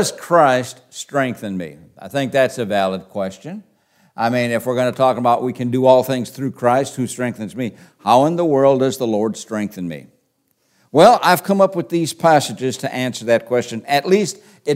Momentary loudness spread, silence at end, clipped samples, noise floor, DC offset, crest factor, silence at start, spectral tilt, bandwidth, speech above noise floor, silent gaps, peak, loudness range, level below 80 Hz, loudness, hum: 14 LU; 0 s; under 0.1%; -65 dBFS; under 0.1%; 18 dB; 0 s; -5 dB/octave; 16 kHz; 48 dB; none; 0 dBFS; 5 LU; -66 dBFS; -17 LUFS; none